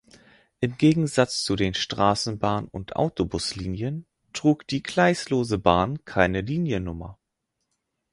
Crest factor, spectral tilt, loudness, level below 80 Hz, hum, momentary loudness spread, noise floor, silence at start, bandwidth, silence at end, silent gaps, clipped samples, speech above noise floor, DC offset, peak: 24 dB; -5.5 dB/octave; -24 LUFS; -46 dBFS; none; 10 LU; -80 dBFS; 0.6 s; 11.5 kHz; 1 s; none; under 0.1%; 56 dB; under 0.1%; -2 dBFS